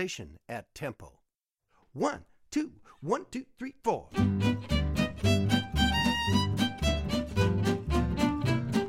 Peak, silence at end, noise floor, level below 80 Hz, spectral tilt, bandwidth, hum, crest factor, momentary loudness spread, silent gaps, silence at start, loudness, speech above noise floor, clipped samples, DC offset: -12 dBFS; 0 s; -81 dBFS; -40 dBFS; -5.5 dB/octave; 16 kHz; none; 18 dB; 15 LU; none; 0 s; -30 LUFS; 49 dB; under 0.1%; under 0.1%